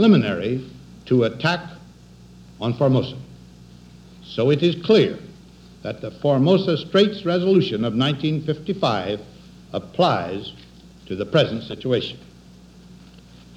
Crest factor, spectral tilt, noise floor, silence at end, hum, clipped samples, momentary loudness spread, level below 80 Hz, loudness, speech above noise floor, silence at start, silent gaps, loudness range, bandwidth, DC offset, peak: 18 dB; -7.5 dB/octave; -46 dBFS; 0.65 s; 60 Hz at -45 dBFS; under 0.1%; 15 LU; -54 dBFS; -21 LUFS; 26 dB; 0 s; none; 5 LU; 9.6 kHz; under 0.1%; -4 dBFS